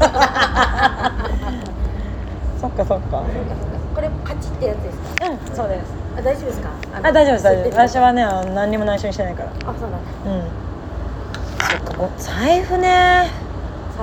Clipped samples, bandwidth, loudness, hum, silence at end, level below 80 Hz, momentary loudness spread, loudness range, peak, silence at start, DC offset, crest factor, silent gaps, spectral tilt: under 0.1%; 17.5 kHz; -19 LUFS; none; 0 s; -28 dBFS; 14 LU; 7 LU; 0 dBFS; 0 s; under 0.1%; 18 dB; none; -5.5 dB/octave